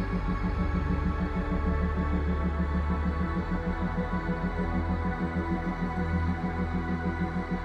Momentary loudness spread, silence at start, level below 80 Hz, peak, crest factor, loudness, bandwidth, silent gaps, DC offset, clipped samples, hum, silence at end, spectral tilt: 2 LU; 0 s; -32 dBFS; -16 dBFS; 12 dB; -30 LUFS; 6.4 kHz; none; under 0.1%; under 0.1%; none; 0 s; -9 dB/octave